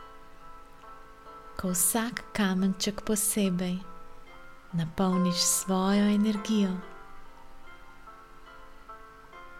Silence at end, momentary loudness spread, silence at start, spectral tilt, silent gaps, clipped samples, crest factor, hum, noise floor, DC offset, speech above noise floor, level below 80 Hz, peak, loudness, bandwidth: 0 s; 24 LU; 0 s; -4 dB/octave; none; under 0.1%; 20 dB; none; -48 dBFS; under 0.1%; 21 dB; -52 dBFS; -10 dBFS; -27 LUFS; 16.5 kHz